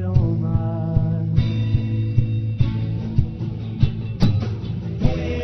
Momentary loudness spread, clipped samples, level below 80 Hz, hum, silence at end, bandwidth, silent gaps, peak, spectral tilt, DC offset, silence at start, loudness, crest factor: 6 LU; under 0.1%; -30 dBFS; none; 0 s; 6.2 kHz; none; -2 dBFS; -9 dB/octave; under 0.1%; 0 s; -22 LUFS; 18 dB